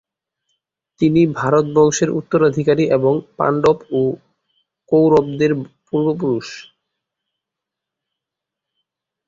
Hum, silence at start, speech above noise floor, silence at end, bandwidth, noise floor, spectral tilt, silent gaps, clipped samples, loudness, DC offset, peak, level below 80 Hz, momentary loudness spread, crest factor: none; 1 s; 68 dB; 2.65 s; 7.8 kHz; -84 dBFS; -6.5 dB/octave; none; under 0.1%; -17 LUFS; under 0.1%; -2 dBFS; -56 dBFS; 9 LU; 16 dB